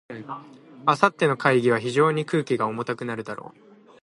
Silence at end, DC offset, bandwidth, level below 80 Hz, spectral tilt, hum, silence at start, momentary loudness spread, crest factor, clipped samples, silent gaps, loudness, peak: 0.55 s; under 0.1%; 11.5 kHz; -70 dBFS; -6 dB/octave; none; 0.1 s; 17 LU; 22 dB; under 0.1%; none; -23 LUFS; -2 dBFS